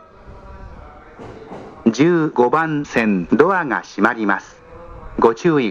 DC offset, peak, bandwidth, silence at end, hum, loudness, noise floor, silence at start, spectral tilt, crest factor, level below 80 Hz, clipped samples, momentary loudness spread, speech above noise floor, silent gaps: under 0.1%; 0 dBFS; 8 kHz; 0 s; none; -17 LUFS; -40 dBFS; 0.25 s; -6.5 dB/octave; 18 dB; -44 dBFS; under 0.1%; 23 LU; 23 dB; none